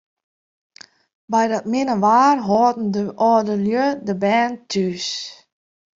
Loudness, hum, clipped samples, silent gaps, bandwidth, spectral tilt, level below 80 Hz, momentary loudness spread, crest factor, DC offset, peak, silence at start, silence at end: -19 LUFS; none; under 0.1%; none; 7.8 kHz; -5 dB/octave; -62 dBFS; 8 LU; 16 dB; under 0.1%; -4 dBFS; 1.3 s; 0.65 s